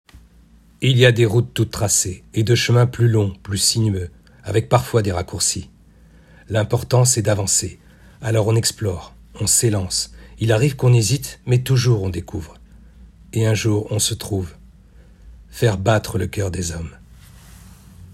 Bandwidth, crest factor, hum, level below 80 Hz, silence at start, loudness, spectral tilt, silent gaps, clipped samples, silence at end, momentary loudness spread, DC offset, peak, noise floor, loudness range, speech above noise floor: 14.5 kHz; 20 dB; none; -44 dBFS; 0.15 s; -19 LUFS; -4.5 dB/octave; none; under 0.1%; 0 s; 12 LU; under 0.1%; 0 dBFS; -49 dBFS; 6 LU; 31 dB